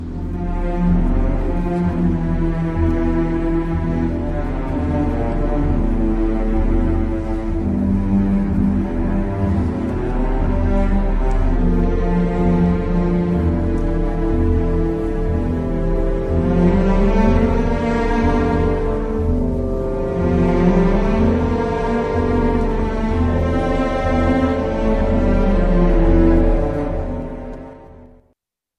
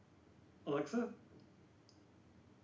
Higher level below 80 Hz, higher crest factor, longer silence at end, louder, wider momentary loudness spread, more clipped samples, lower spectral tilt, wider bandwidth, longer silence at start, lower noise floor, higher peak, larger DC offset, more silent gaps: first, -20 dBFS vs -78 dBFS; about the same, 16 dB vs 20 dB; first, 0.7 s vs 0.25 s; first, -19 LUFS vs -42 LUFS; second, 6 LU vs 26 LU; neither; first, -9 dB/octave vs -6.5 dB/octave; second, 6.4 kHz vs 8 kHz; second, 0 s vs 0.4 s; about the same, -67 dBFS vs -66 dBFS; first, 0 dBFS vs -26 dBFS; neither; neither